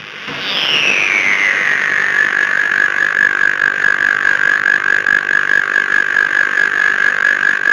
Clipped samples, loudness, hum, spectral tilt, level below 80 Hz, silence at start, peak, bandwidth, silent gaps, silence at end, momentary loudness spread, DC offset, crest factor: under 0.1%; -12 LUFS; none; -1 dB/octave; -68 dBFS; 0 s; 0 dBFS; 12 kHz; none; 0 s; 2 LU; under 0.1%; 14 dB